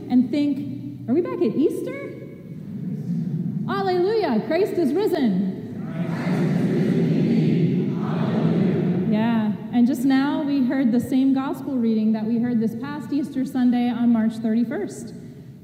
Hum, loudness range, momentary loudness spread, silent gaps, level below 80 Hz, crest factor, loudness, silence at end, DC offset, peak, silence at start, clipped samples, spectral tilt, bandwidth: none; 4 LU; 11 LU; none; -62 dBFS; 12 dB; -22 LUFS; 0.05 s; under 0.1%; -8 dBFS; 0 s; under 0.1%; -8 dB/octave; 15.5 kHz